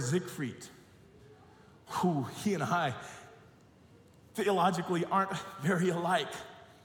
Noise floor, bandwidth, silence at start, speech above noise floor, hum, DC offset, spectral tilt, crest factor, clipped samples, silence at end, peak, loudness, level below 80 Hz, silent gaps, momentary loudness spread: -59 dBFS; 18 kHz; 0 s; 28 dB; none; under 0.1%; -5.5 dB/octave; 18 dB; under 0.1%; 0.2 s; -16 dBFS; -32 LUFS; -72 dBFS; none; 17 LU